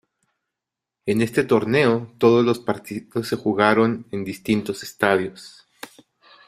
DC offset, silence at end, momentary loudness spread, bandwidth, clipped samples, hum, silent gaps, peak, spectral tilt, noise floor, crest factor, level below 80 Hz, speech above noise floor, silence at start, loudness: under 0.1%; 0.6 s; 15 LU; 15 kHz; under 0.1%; none; none; -2 dBFS; -6 dB/octave; -85 dBFS; 20 dB; -60 dBFS; 65 dB; 1.05 s; -21 LUFS